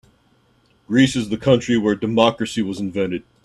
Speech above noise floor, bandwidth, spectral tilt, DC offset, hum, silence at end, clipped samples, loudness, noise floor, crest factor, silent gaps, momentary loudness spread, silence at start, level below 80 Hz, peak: 40 dB; 12 kHz; -5.5 dB/octave; under 0.1%; none; 0.25 s; under 0.1%; -19 LUFS; -59 dBFS; 20 dB; none; 7 LU; 0.9 s; -52 dBFS; 0 dBFS